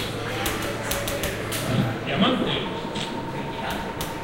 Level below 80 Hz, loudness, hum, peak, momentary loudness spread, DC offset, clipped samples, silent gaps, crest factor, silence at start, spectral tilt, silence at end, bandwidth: -42 dBFS; -26 LUFS; none; -8 dBFS; 8 LU; under 0.1%; under 0.1%; none; 20 dB; 0 s; -4.5 dB/octave; 0 s; 17 kHz